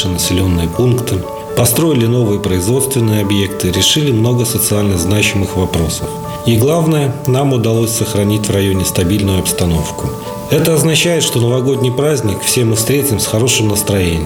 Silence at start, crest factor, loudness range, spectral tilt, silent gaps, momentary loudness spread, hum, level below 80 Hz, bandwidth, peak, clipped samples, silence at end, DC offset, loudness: 0 s; 12 dB; 1 LU; -4.5 dB/octave; none; 5 LU; none; -34 dBFS; over 20 kHz; 0 dBFS; under 0.1%; 0 s; under 0.1%; -13 LUFS